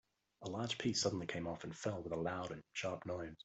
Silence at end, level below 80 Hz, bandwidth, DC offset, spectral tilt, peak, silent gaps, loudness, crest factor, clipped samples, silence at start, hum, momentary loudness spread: 0 s; -70 dBFS; 8.2 kHz; under 0.1%; -4 dB/octave; -22 dBFS; none; -41 LUFS; 20 dB; under 0.1%; 0.4 s; none; 9 LU